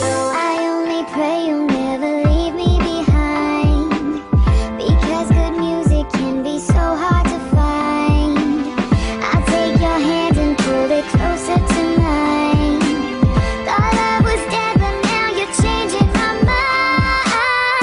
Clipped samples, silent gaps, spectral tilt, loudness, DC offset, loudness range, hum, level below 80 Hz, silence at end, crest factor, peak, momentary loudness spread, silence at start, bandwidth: under 0.1%; none; -6 dB/octave; -16 LUFS; under 0.1%; 1 LU; none; -22 dBFS; 0 s; 14 dB; -2 dBFS; 4 LU; 0 s; 11 kHz